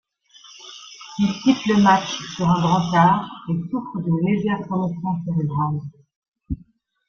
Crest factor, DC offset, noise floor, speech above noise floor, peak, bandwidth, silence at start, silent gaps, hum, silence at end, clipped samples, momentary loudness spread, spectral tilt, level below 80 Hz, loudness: 18 dB; under 0.1%; -54 dBFS; 34 dB; -4 dBFS; 7 kHz; 0.45 s; 6.16-6.22 s, 6.28-6.32 s; none; 0.55 s; under 0.1%; 18 LU; -6.5 dB/octave; -48 dBFS; -21 LUFS